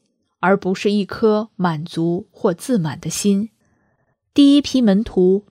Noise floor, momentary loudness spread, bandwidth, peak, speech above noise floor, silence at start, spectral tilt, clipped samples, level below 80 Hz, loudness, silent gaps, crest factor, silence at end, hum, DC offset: -65 dBFS; 9 LU; 15.5 kHz; -2 dBFS; 49 dB; 0.4 s; -6 dB/octave; under 0.1%; -50 dBFS; -18 LUFS; none; 16 dB; 0.1 s; none; under 0.1%